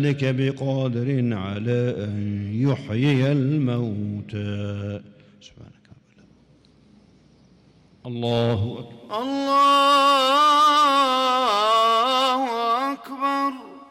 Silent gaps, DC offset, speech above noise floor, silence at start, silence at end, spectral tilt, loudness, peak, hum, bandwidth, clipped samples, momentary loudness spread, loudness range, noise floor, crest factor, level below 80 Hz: none; under 0.1%; 34 dB; 0 s; 0.05 s; -5.5 dB/octave; -21 LUFS; -12 dBFS; none; 16.5 kHz; under 0.1%; 14 LU; 16 LU; -55 dBFS; 12 dB; -62 dBFS